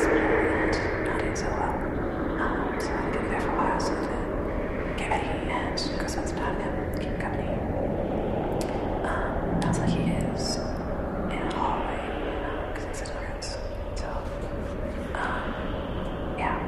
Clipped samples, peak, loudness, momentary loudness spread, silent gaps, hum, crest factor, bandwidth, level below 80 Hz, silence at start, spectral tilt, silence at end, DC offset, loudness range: under 0.1%; -12 dBFS; -29 LUFS; 8 LU; none; none; 16 dB; 14 kHz; -36 dBFS; 0 s; -6 dB/octave; 0 s; under 0.1%; 5 LU